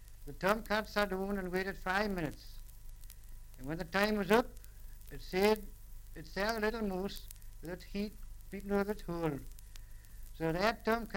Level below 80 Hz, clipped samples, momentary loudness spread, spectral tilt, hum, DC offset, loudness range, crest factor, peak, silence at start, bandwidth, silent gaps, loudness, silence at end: -48 dBFS; under 0.1%; 23 LU; -5.5 dB/octave; 50 Hz at -55 dBFS; under 0.1%; 5 LU; 24 dB; -12 dBFS; 0 s; 17 kHz; none; -35 LUFS; 0 s